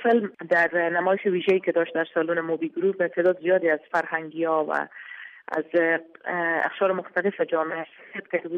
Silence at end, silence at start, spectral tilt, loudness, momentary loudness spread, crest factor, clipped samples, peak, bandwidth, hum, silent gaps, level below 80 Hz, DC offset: 0 s; 0 s; -7 dB/octave; -24 LUFS; 9 LU; 14 dB; under 0.1%; -10 dBFS; 7.4 kHz; none; none; -78 dBFS; under 0.1%